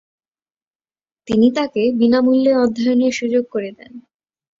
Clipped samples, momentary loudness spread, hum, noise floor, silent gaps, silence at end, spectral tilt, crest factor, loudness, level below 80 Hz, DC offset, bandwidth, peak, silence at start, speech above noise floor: under 0.1%; 9 LU; none; under -90 dBFS; none; 0.6 s; -5.5 dB/octave; 14 dB; -16 LUFS; -58 dBFS; under 0.1%; 7.6 kHz; -4 dBFS; 1.25 s; over 74 dB